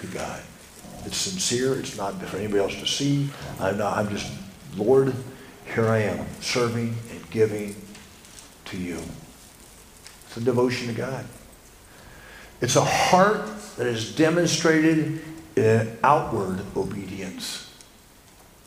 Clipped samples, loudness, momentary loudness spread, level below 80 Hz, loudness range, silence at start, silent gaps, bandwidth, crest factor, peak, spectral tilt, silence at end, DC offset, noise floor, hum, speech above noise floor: under 0.1%; -24 LUFS; 22 LU; -54 dBFS; 9 LU; 0 s; none; 15.5 kHz; 24 dB; -2 dBFS; -4.5 dB/octave; 0.9 s; under 0.1%; -51 dBFS; none; 28 dB